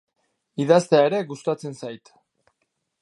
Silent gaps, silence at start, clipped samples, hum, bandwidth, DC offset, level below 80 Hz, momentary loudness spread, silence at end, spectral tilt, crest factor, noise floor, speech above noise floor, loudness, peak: none; 0.6 s; under 0.1%; none; 11.5 kHz; under 0.1%; -76 dBFS; 20 LU; 1.05 s; -6 dB/octave; 20 dB; -75 dBFS; 54 dB; -21 LUFS; -2 dBFS